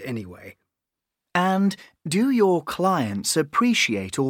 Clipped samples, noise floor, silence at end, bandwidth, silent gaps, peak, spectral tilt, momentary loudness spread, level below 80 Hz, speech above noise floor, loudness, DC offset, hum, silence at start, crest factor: under 0.1%; -85 dBFS; 0 s; 17.5 kHz; none; -6 dBFS; -4.5 dB/octave; 13 LU; -64 dBFS; 63 dB; -22 LUFS; under 0.1%; none; 0 s; 16 dB